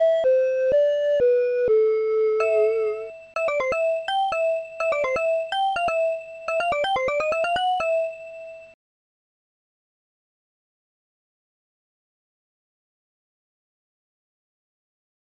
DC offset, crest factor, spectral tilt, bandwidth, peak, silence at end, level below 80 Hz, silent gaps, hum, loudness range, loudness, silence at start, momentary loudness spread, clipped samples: under 0.1%; 14 dB; -3 dB/octave; 9.8 kHz; -12 dBFS; 6.7 s; -60 dBFS; none; none; 7 LU; -22 LUFS; 0 s; 8 LU; under 0.1%